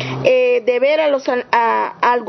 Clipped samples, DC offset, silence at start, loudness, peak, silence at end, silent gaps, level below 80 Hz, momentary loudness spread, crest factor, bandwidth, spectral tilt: under 0.1%; under 0.1%; 0 s; -15 LUFS; 0 dBFS; 0 s; none; -62 dBFS; 3 LU; 16 dB; 6.2 kHz; -5.5 dB/octave